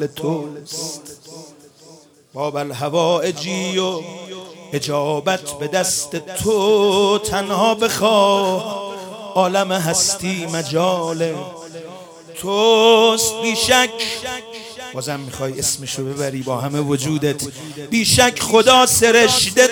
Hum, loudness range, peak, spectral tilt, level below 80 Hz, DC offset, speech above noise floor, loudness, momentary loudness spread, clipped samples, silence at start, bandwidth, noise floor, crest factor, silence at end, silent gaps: none; 6 LU; 0 dBFS; -3 dB/octave; -50 dBFS; under 0.1%; 29 dB; -17 LUFS; 18 LU; under 0.1%; 0 s; 18.5 kHz; -46 dBFS; 18 dB; 0 s; none